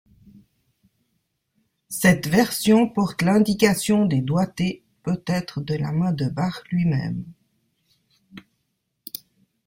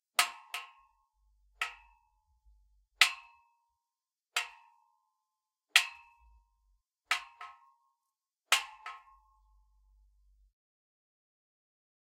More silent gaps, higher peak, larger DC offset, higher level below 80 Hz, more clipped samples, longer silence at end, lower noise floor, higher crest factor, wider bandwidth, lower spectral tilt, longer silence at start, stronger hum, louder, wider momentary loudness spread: neither; about the same, -2 dBFS vs -4 dBFS; neither; first, -54 dBFS vs -72 dBFS; neither; second, 1.25 s vs 3.1 s; second, -75 dBFS vs under -90 dBFS; second, 20 dB vs 36 dB; about the same, 16.5 kHz vs 16 kHz; first, -6 dB/octave vs 3.5 dB/octave; first, 1.9 s vs 0.2 s; neither; first, -22 LUFS vs -31 LUFS; second, 15 LU vs 23 LU